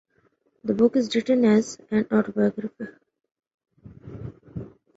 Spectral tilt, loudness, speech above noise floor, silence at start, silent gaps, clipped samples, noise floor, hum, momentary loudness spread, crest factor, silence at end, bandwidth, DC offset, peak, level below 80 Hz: -6.5 dB/octave; -23 LUFS; 44 dB; 0.65 s; 3.54-3.58 s; under 0.1%; -66 dBFS; none; 20 LU; 18 dB; 0.3 s; 8 kHz; under 0.1%; -8 dBFS; -58 dBFS